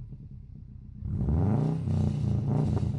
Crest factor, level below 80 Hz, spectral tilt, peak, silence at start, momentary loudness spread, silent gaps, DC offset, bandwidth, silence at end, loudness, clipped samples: 14 dB; -42 dBFS; -10 dB/octave; -14 dBFS; 0 s; 20 LU; none; under 0.1%; 9.4 kHz; 0 s; -28 LUFS; under 0.1%